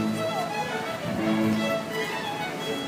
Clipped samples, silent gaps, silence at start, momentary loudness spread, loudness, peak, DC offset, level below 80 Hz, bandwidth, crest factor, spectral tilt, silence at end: under 0.1%; none; 0 s; 6 LU; -28 LUFS; -14 dBFS; under 0.1%; -62 dBFS; 15.5 kHz; 14 dB; -5 dB/octave; 0 s